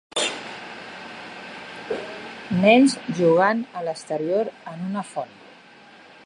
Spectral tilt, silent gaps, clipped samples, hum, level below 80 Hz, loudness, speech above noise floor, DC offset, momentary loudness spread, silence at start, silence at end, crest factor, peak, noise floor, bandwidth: -5 dB/octave; none; under 0.1%; none; -66 dBFS; -22 LUFS; 28 dB; under 0.1%; 20 LU; 0.15 s; 1 s; 20 dB; -4 dBFS; -48 dBFS; 11 kHz